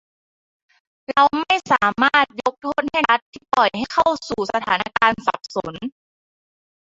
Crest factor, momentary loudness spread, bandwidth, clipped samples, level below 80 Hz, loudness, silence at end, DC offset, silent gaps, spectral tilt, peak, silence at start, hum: 20 dB; 11 LU; 8 kHz; under 0.1%; -56 dBFS; -19 LUFS; 1.05 s; under 0.1%; 3.22-3.33 s; -3.5 dB/octave; -2 dBFS; 1.1 s; none